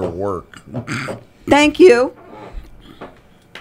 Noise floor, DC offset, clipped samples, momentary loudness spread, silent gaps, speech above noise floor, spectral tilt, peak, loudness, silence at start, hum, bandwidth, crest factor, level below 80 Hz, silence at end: -44 dBFS; under 0.1%; under 0.1%; 22 LU; none; 29 dB; -5 dB/octave; 0 dBFS; -14 LUFS; 0 s; none; 11.5 kHz; 18 dB; -42 dBFS; 0 s